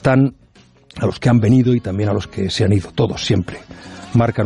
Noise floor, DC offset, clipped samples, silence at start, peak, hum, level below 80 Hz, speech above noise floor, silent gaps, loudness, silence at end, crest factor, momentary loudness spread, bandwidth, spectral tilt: -49 dBFS; under 0.1%; under 0.1%; 0.05 s; -2 dBFS; none; -44 dBFS; 33 dB; none; -17 LUFS; 0 s; 14 dB; 18 LU; 11 kHz; -7 dB/octave